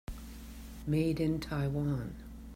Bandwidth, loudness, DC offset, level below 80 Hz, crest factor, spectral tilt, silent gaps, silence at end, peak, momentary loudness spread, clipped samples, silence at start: 16 kHz; -34 LUFS; under 0.1%; -48 dBFS; 16 dB; -7.5 dB/octave; none; 0 s; -20 dBFS; 17 LU; under 0.1%; 0.1 s